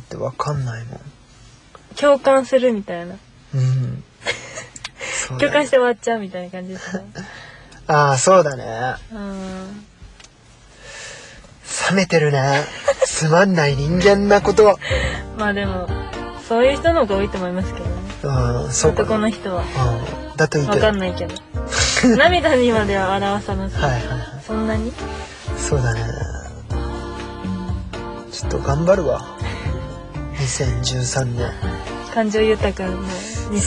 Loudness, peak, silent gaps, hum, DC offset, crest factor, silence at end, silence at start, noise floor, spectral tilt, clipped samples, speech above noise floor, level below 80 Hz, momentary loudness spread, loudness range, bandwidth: -19 LUFS; -2 dBFS; none; none; under 0.1%; 18 dB; 0 s; 0 s; -47 dBFS; -5 dB/octave; under 0.1%; 29 dB; -34 dBFS; 16 LU; 7 LU; 11 kHz